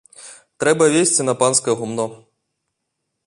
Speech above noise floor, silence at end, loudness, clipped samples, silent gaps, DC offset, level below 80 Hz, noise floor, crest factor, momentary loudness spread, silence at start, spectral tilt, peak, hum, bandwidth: 59 dB; 1.1 s; -17 LUFS; under 0.1%; none; under 0.1%; -64 dBFS; -76 dBFS; 18 dB; 11 LU; 0.2 s; -3.5 dB/octave; -2 dBFS; none; 11.5 kHz